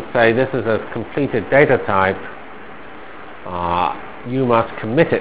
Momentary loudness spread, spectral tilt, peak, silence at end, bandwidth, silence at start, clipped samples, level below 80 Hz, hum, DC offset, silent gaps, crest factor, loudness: 22 LU; -10 dB/octave; 0 dBFS; 0 s; 4 kHz; 0 s; under 0.1%; -44 dBFS; none; 2%; none; 18 dB; -18 LUFS